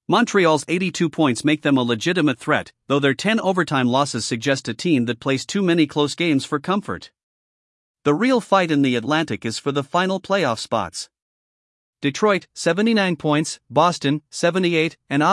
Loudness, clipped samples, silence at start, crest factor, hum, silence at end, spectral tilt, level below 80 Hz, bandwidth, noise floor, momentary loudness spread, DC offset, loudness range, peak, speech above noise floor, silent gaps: -20 LUFS; under 0.1%; 0.1 s; 18 dB; none; 0 s; -5 dB/octave; -66 dBFS; 12 kHz; under -90 dBFS; 6 LU; under 0.1%; 3 LU; -2 dBFS; over 70 dB; 7.23-7.94 s, 11.22-11.93 s